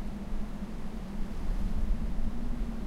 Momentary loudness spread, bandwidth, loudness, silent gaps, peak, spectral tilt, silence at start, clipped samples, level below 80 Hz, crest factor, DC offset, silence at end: 5 LU; 7.4 kHz; -38 LUFS; none; -18 dBFS; -7.5 dB/octave; 0 s; under 0.1%; -32 dBFS; 12 dB; under 0.1%; 0 s